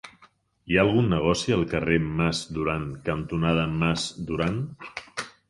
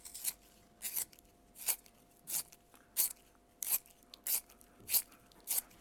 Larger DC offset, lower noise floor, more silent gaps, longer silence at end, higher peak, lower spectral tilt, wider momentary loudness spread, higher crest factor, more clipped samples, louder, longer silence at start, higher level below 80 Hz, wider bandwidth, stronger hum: neither; second, -59 dBFS vs -65 dBFS; neither; about the same, 0.2 s vs 0.15 s; first, -6 dBFS vs -10 dBFS; first, -6 dB/octave vs 1.5 dB/octave; second, 12 LU vs 19 LU; second, 20 dB vs 30 dB; neither; first, -25 LUFS vs -37 LUFS; about the same, 0.05 s vs 0.05 s; first, -44 dBFS vs -72 dBFS; second, 11.5 kHz vs 19.5 kHz; neither